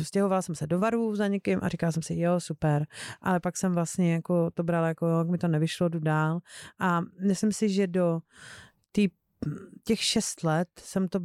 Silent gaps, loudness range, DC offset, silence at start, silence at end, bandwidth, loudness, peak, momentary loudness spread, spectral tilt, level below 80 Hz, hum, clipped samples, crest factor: none; 2 LU; under 0.1%; 0 s; 0 s; 14 kHz; -28 LUFS; -14 dBFS; 9 LU; -5.5 dB/octave; -62 dBFS; none; under 0.1%; 14 dB